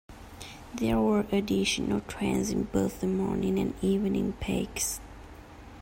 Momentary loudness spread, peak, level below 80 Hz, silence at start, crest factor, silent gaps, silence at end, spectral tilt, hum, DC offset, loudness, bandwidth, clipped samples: 20 LU; -14 dBFS; -46 dBFS; 0.1 s; 16 dB; none; 0 s; -5 dB/octave; none; under 0.1%; -29 LUFS; 16.5 kHz; under 0.1%